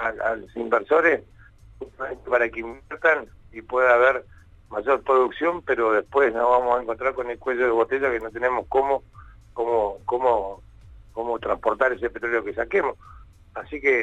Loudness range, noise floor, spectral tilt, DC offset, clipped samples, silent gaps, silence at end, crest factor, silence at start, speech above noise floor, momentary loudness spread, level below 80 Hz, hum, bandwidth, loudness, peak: 4 LU; -47 dBFS; -6 dB/octave; under 0.1%; under 0.1%; none; 0 s; 18 dB; 0 s; 24 dB; 15 LU; -50 dBFS; none; 8 kHz; -23 LUFS; -4 dBFS